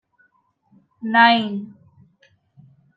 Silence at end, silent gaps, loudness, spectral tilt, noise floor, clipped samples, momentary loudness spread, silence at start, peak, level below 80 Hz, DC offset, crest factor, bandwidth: 1.3 s; none; -17 LUFS; -6.5 dB/octave; -64 dBFS; under 0.1%; 20 LU; 1 s; -2 dBFS; -76 dBFS; under 0.1%; 20 dB; 5.2 kHz